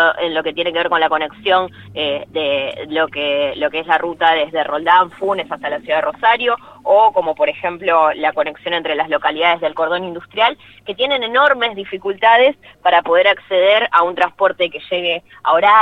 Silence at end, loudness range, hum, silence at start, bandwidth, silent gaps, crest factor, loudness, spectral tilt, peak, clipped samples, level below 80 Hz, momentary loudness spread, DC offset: 0 s; 4 LU; none; 0 s; 5.8 kHz; none; 16 dB; -16 LUFS; -5 dB/octave; 0 dBFS; under 0.1%; -58 dBFS; 8 LU; under 0.1%